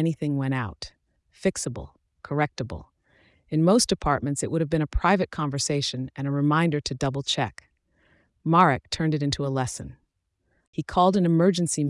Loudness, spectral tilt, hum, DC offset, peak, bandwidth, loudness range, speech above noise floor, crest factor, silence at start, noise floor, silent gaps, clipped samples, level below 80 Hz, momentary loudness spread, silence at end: -25 LUFS; -5 dB/octave; none; under 0.1%; -6 dBFS; 12 kHz; 3 LU; 50 dB; 18 dB; 0 s; -74 dBFS; 10.67-10.73 s; under 0.1%; -44 dBFS; 15 LU; 0 s